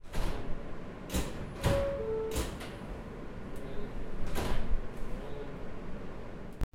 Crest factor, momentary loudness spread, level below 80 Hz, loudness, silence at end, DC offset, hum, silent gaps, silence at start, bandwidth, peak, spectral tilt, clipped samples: 16 dB; 12 LU; -38 dBFS; -39 LUFS; 0.1 s; under 0.1%; none; none; 0 s; 16 kHz; -16 dBFS; -5.5 dB/octave; under 0.1%